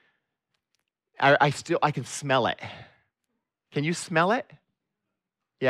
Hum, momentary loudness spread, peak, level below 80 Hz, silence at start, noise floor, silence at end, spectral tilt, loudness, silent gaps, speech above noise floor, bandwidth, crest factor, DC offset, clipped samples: none; 12 LU; -8 dBFS; -70 dBFS; 1.2 s; -85 dBFS; 0 s; -4.5 dB/octave; -25 LUFS; none; 60 dB; 13.5 kHz; 20 dB; under 0.1%; under 0.1%